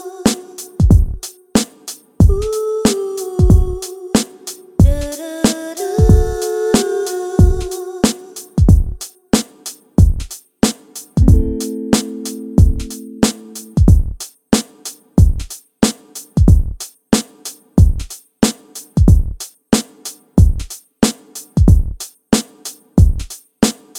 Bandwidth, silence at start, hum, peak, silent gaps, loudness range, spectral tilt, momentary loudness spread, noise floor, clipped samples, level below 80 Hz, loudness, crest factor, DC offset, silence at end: 17 kHz; 0 s; none; 0 dBFS; none; 2 LU; -6 dB/octave; 17 LU; -35 dBFS; under 0.1%; -18 dBFS; -16 LUFS; 14 dB; under 0.1%; 0 s